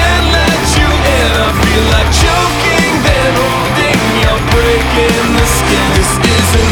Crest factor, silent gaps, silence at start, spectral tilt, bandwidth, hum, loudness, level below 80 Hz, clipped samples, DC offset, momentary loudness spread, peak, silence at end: 10 dB; none; 0 s; -4 dB/octave; over 20 kHz; none; -10 LUFS; -16 dBFS; under 0.1%; under 0.1%; 1 LU; 0 dBFS; 0 s